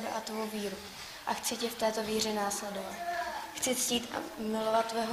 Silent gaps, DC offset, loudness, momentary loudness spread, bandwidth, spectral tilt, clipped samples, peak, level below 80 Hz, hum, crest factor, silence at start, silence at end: none; under 0.1%; -33 LUFS; 9 LU; 15.5 kHz; -2.5 dB/octave; under 0.1%; -16 dBFS; -66 dBFS; none; 18 dB; 0 s; 0 s